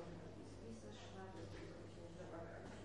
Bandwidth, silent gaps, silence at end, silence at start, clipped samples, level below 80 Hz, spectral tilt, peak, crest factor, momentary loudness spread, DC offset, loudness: 11 kHz; none; 0 s; 0 s; under 0.1%; -66 dBFS; -6 dB/octave; -40 dBFS; 14 dB; 3 LU; under 0.1%; -55 LUFS